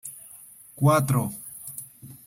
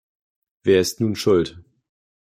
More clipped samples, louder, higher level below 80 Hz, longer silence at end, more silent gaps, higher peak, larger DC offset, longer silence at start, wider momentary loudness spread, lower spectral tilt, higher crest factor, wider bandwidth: neither; second, -24 LUFS vs -20 LUFS; about the same, -60 dBFS vs -56 dBFS; second, 0.1 s vs 0.65 s; neither; second, -8 dBFS vs -4 dBFS; neither; second, 0.05 s vs 0.65 s; first, 23 LU vs 8 LU; first, -6.5 dB/octave vs -5 dB/octave; about the same, 20 dB vs 18 dB; about the same, 16.5 kHz vs 16 kHz